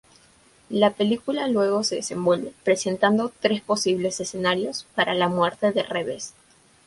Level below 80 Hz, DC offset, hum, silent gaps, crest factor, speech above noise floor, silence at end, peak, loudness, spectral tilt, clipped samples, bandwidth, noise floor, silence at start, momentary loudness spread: -64 dBFS; under 0.1%; none; none; 20 dB; 33 dB; 0.55 s; -4 dBFS; -23 LUFS; -4 dB/octave; under 0.1%; 11.5 kHz; -56 dBFS; 0.7 s; 7 LU